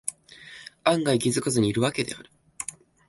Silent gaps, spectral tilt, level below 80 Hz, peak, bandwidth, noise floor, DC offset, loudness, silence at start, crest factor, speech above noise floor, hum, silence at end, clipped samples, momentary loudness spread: none; -4.5 dB/octave; -60 dBFS; -6 dBFS; 12 kHz; -47 dBFS; under 0.1%; -26 LUFS; 0.05 s; 20 dB; 23 dB; none; 0.4 s; under 0.1%; 20 LU